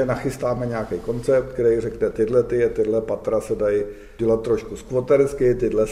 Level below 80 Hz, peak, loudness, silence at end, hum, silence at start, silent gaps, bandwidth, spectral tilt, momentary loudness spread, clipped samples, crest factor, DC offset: -42 dBFS; -6 dBFS; -22 LUFS; 0 s; none; 0 s; none; 14 kHz; -7.5 dB/octave; 7 LU; under 0.1%; 14 dB; under 0.1%